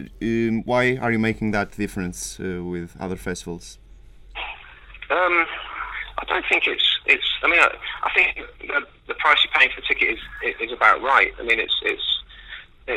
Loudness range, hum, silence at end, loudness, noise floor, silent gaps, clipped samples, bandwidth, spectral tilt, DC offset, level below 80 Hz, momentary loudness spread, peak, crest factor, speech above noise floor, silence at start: 10 LU; none; 0 s; -20 LUFS; -45 dBFS; none; under 0.1%; 15 kHz; -3.5 dB/octave; under 0.1%; -46 dBFS; 16 LU; 0 dBFS; 22 dB; 23 dB; 0 s